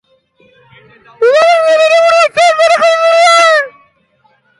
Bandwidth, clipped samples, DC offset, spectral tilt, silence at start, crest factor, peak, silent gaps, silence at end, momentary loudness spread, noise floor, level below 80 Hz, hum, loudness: 11.5 kHz; under 0.1%; under 0.1%; 0 dB/octave; 1.2 s; 10 dB; 0 dBFS; none; 0.9 s; 5 LU; -53 dBFS; -62 dBFS; none; -8 LUFS